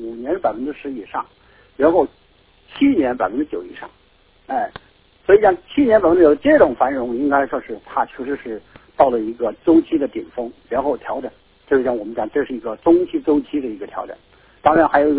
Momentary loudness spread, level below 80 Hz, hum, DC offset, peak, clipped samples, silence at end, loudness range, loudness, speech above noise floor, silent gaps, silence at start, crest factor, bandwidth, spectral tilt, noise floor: 16 LU; -48 dBFS; none; under 0.1%; 0 dBFS; under 0.1%; 0 s; 5 LU; -18 LUFS; 37 dB; none; 0 s; 18 dB; 4 kHz; -10 dB/octave; -54 dBFS